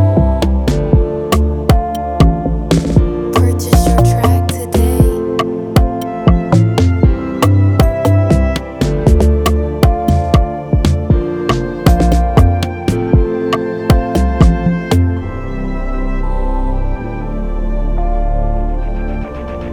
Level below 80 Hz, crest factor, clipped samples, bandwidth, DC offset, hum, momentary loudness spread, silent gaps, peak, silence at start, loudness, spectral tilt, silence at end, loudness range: -16 dBFS; 12 dB; under 0.1%; 18 kHz; under 0.1%; none; 10 LU; none; 0 dBFS; 0 s; -14 LUFS; -7 dB/octave; 0 s; 7 LU